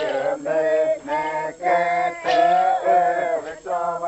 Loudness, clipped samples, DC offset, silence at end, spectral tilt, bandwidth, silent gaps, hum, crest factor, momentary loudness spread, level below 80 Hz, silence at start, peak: -21 LUFS; under 0.1%; under 0.1%; 0 s; -4 dB/octave; 8.4 kHz; none; none; 14 dB; 8 LU; -62 dBFS; 0 s; -8 dBFS